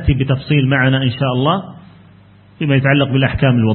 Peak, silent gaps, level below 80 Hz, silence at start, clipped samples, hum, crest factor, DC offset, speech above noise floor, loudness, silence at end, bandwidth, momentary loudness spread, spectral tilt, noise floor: 0 dBFS; none; -32 dBFS; 0 s; under 0.1%; none; 14 dB; under 0.1%; 31 dB; -15 LUFS; 0 s; 4.4 kHz; 6 LU; -12.5 dB/octave; -44 dBFS